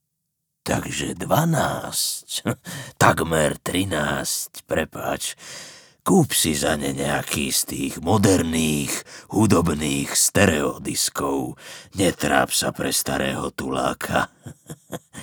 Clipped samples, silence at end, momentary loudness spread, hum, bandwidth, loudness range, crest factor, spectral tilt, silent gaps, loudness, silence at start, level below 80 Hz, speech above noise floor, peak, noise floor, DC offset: under 0.1%; 0 s; 13 LU; none; over 20 kHz; 3 LU; 22 dB; -4 dB/octave; none; -22 LUFS; 0.65 s; -46 dBFS; 55 dB; 0 dBFS; -77 dBFS; under 0.1%